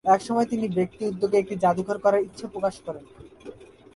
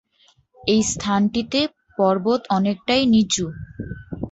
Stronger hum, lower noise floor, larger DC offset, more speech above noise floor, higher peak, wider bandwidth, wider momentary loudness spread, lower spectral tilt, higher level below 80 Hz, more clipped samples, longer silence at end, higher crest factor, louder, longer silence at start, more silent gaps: neither; second, -45 dBFS vs -59 dBFS; neither; second, 20 dB vs 39 dB; about the same, -6 dBFS vs -6 dBFS; first, 11.5 kHz vs 8.2 kHz; first, 21 LU vs 15 LU; first, -6.5 dB/octave vs -4.5 dB/octave; second, -60 dBFS vs -48 dBFS; neither; first, 0.3 s vs 0 s; about the same, 18 dB vs 16 dB; second, -25 LUFS vs -20 LUFS; second, 0.05 s vs 0.65 s; neither